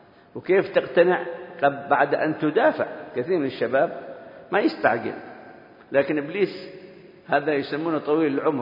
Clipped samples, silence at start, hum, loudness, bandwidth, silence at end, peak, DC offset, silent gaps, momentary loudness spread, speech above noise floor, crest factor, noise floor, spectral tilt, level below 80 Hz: under 0.1%; 0.35 s; none; -23 LUFS; 5.4 kHz; 0 s; -4 dBFS; under 0.1%; none; 17 LU; 24 dB; 20 dB; -46 dBFS; -8.5 dB/octave; -72 dBFS